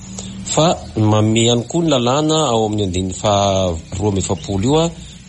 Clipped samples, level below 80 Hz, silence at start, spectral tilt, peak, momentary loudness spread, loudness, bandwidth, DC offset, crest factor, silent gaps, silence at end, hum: under 0.1%; -38 dBFS; 0 s; -5 dB/octave; -4 dBFS; 6 LU; -16 LUFS; 10.5 kHz; under 0.1%; 12 dB; none; 0.05 s; none